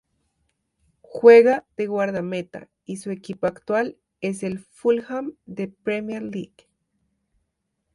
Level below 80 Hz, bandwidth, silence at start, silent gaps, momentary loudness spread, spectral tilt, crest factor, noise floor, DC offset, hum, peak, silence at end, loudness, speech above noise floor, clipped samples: -66 dBFS; 11.5 kHz; 1.15 s; none; 21 LU; -6.5 dB/octave; 22 dB; -76 dBFS; under 0.1%; none; -2 dBFS; 1.5 s; -21 LUFS; 55 dB; under 0.1%